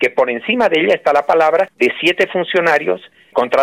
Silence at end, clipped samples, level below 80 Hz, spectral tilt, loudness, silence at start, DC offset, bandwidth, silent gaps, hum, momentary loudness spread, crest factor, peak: 0 s; under 0.1%; -60 dBFS; -4.5 dB/octave; -15 LUFS; 0 s; under 0.1%; 15.5 kHz; none; none; 6 LU; 12 dB; -4 dBFS